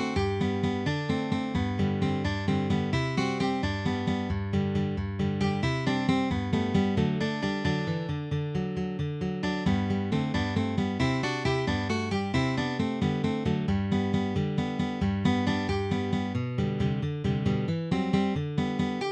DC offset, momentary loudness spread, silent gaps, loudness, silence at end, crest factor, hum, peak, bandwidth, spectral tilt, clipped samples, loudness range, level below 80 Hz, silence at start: under 0.1%; 4 LU; none; -28 LUFS; 0 s; 16 dB; none; -12 dBFS; 9.4 kHz; -7 dB/octave; under 0.1%; 1 LU; -46 dBFS; 0 s